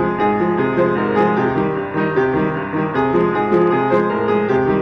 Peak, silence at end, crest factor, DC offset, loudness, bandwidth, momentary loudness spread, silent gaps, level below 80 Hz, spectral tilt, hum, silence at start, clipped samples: -6 dBFS; 0 s; 10 dB; 0.1%; -17 LUFS; 6.2 kHz; 4 LU; none; -46 dBFS; -9 dB/octave; none; 0 s; under 0.1%